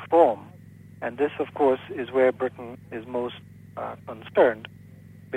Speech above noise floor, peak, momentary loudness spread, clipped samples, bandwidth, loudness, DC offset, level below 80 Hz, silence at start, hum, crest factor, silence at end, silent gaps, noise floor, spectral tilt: 23 dB; -6 dBFS; 17 LU; under 0.1%; 9 kHz; -25 LUFS; under 0.1%; -66 dBFS; 0 s; none; 20 dB; 0 s; none; -47 dBFS; -7.5 dB/octave